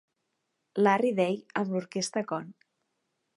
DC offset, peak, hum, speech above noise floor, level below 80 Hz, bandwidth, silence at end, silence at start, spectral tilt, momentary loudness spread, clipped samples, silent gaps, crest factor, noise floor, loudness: under 0.1%; -10 dBFS; none; 52 dB; -82 dBFS; 11.5 kHz; 0.85 s; 0.75 s; -5 dB/octave; 13 LU; under 0.1%; none; 22 dB; -80 dBFS; -29 LUFS